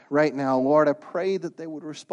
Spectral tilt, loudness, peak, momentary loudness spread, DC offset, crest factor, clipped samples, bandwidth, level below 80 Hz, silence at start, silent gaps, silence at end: -6.5 dB/octave; -23 LUFS; -8 dBFS; 15 LU; under 0.1%; 16 dB; under 0.1%; 9.8 kHz; -74 dBFS; 0.1 s; none; 0.1 s